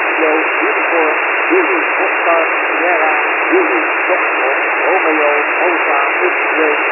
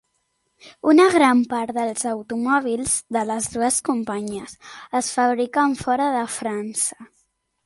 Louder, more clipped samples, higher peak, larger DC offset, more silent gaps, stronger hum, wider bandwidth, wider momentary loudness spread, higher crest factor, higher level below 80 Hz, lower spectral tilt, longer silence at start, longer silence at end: first, -12 LUFS vs -21 LUFS; neither; about the same, 0 dBFS vs -2 dBFS; neither; neither; neither; second, 3 kHz vs 12 kHz; second, 1 LU vs 11 LU; second, 14 dB vs 20 dB; second, under -90 dBFS vs -58 dBFS; about the same, -4 dB/octave vs -3 dB/octave; second, 0 s vs 0.65 s; second, 0 s vs 0.6 s